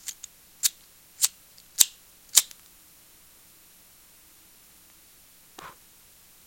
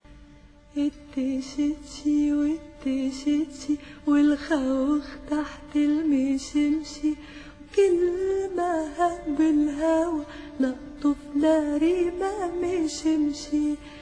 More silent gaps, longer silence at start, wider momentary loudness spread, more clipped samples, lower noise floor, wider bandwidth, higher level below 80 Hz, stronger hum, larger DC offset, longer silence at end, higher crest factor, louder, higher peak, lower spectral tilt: neither; about the same, 0.05 s vs 0.1 s; first, 24 LU vs 8 LU; neither; first, -55 dBFS vs -51 dBFS; first, 17 kHz vs 10 kHz; second, -70 dBFS vs -50 dBFS; neither; neither; first, 0.75 s vs 0 s; first, 32 dB vs 16 dB; about the same, -24 LUFS vs -25 LUFS; first, 0 dBFS vs -10 dBFS; second, 3.5 dB/octave vs -5 dB/octave